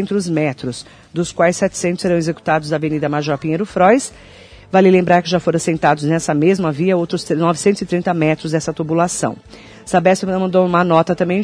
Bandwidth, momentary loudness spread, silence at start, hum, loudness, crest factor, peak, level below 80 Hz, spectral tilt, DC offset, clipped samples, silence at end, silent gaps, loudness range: 11 kHz; 8 LU; 0 s; none; -16 LUFS; 16 dB; 0 dBFS; -50 dBFS; -5.5 dB/octave; under 0.1%; under 0.1%; 0 s; none; 3 LU